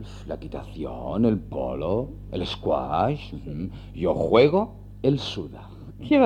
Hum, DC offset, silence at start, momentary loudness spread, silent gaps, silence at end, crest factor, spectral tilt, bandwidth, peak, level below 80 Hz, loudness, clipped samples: none; under 0.1%; 0 s; 16 LU; none; 0 s; 20 dB; -7.5 dB/octave; 9.6 kHz; -4 dBFS; -42 dBFS; -25 LUFS; under 0.1%